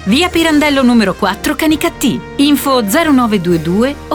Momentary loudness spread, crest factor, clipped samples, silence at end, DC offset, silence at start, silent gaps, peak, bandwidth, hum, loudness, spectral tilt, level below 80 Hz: 5 LU; 10 dB; under 0.1%; 0 s; under 0.1%; 0 s; none; -2 dBFS; 19.5 kHz; none; -12 LUFS; -4.5 dB/octave; -34 dBFS